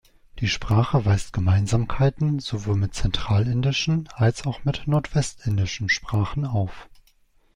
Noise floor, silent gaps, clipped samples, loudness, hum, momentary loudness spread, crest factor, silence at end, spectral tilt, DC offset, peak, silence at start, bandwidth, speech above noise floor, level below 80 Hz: -59 dBFS; none; under 0.1%; -24 LUFS; none; 6 LU; 16 dB; 0.7 s; -6 dB/octave; under 0.1%; -6 dBFS; 0.35 s; 11 kHz; 37 dB; -38 dBFS